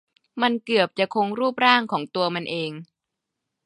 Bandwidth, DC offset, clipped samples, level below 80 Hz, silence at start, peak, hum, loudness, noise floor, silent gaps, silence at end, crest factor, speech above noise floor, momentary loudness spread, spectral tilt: 11.5 kHz; under 0.1%; under 0.1%; -76 dBFS; 0.35 s; -2 dBFS; none; -22 LUFS; -83 dBFS; none; 0.8 s; 24 dB; 61 dB; 12 LU; -5.5 dB/octave